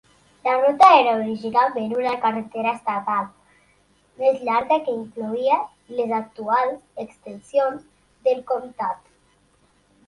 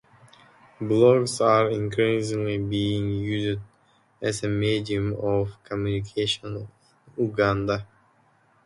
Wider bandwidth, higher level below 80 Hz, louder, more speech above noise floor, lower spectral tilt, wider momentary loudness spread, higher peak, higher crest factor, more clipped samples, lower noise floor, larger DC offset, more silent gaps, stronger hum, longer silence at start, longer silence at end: about the same, 11.5 kHz vs 11.5 kHz; second, -66 dBFS vs -50 dBFS; first, -21 LUFS vs -24 LUFS; about the same, 40 dB vs 38 dB; about the same, -5 dB/octave vs -6 dB/octave; first, 14 LU vs 11 LU; first, -2 dBFS vs -6 dBFS; about the same, 20 dB vs 20 dB; neither; about the same, -61 dBFS vs -62 dBFS; neither; neither; neither; second, 0.45 s vs 0.8 s; first, 1.1 s vs 0.8 s